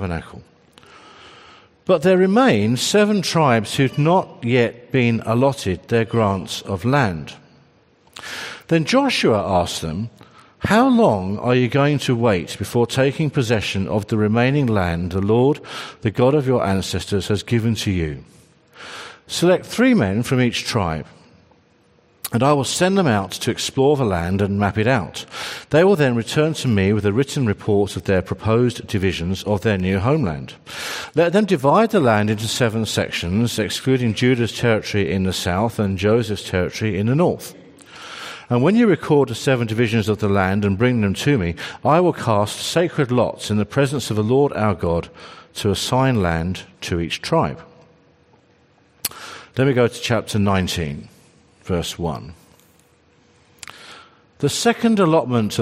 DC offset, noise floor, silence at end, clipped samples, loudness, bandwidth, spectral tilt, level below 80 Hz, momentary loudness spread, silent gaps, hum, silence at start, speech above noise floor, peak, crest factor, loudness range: under 0.1%; -56 dBFS; 0 s; under 0.1%; -19 LUFS; 15.5 kHz; -5.5 dB/octave; -50 dBFS; 13 LU; none; none; 0 s; 38 dB; -2 dBFS; 16 dB; 4 LU